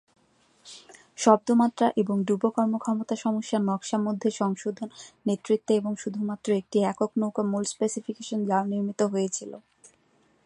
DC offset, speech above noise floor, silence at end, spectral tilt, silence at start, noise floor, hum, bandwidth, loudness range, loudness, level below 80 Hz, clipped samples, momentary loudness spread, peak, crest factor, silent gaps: under 0.1%; 39 dB; 0.6 s; -5.5 dB/octave; 0.65 s; -65 dBFS; none; 10.5 kHz; 3 LU; -26 LUFS; -74 dBFS; under 0.1%; 12 LU; -4 dBFS; 22 dB; none